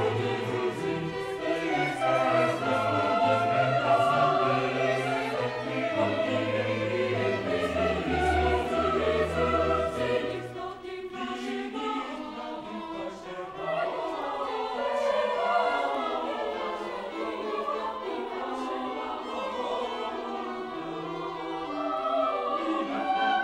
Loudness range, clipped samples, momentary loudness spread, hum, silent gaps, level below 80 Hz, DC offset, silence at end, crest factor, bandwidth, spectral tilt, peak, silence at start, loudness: 8 LU; under 0.1%; 11 LU; none; none; -48 dBFS; under 0.1%; 0 s; 18 dB; 13.5 kHz; -6 dB/octave; -12 dBFS; 0 s; -29 LUFS